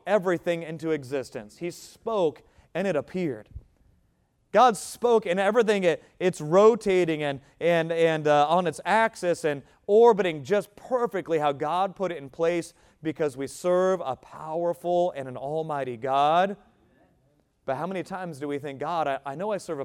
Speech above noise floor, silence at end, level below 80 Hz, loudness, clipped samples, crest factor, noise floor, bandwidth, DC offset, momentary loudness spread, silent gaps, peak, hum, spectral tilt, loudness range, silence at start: 43 dB; 0 s; -62 dBFS; -25 LUFS; under 0.1%; 20 dB; -68 dBFS; 15 kHz; under 0.1%; 14 LU; none; -6 dBFS; none; -5.5 dB/octave; 7 LU; 0.05 s